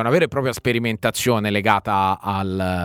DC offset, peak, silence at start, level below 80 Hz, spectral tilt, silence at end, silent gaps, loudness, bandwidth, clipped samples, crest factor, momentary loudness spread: under 0.1%; 0 dBFS; 0 s; -50 dBFS; -5 dB/octave; 0 s; none; -20 LUFS; 19 kHz; under 0.1%; 20 dB; 5 LU